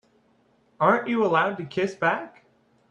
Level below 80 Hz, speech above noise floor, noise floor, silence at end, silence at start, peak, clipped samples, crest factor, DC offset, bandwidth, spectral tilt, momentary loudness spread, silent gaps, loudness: -70 dBFS; 40 dB; -63 dBFS; 0.6 s; 0.8 s; -4 dBFS; under 0.1%; 22 dB; under 0.1%; 10 kHz; -6.5 dB/octave; 8 LU; none; -24 LUFS